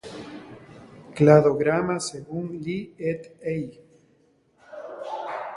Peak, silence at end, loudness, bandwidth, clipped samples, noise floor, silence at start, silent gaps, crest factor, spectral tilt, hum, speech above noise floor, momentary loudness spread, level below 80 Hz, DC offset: -2 dBFS; 0 s; -24 LUFS; 11.5 kHz; under 0.1%; -63 dBFS; 0.05 s; none; 24 dB; -6.5 dB/octave; none; 40 dB; 25 LU; -60 dBFS; under 0.1%